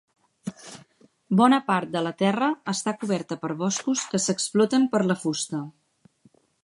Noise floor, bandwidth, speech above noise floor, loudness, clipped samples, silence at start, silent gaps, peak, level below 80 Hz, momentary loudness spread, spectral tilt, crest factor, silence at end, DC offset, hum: -61 dBFS; 11.5 kHz; 37 dB; -24 LUFS; under 0.1%; 0.45 s; none; -4 dBFS; -74 dBFS; 18 LU; -4.5 dB/octave; 20 dB; 0.95 s; under 0.1%; none